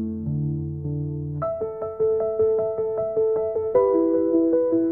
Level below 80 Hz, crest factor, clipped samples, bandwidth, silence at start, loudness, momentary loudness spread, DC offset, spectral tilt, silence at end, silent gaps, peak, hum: -54 dBFS; 14 dB; under 0.1%; 2.3 kHz; 0 s; -23 LUFS; 9 LU; 0.1%; -14 dB/octave; 0 s; none; -8 dBFS; none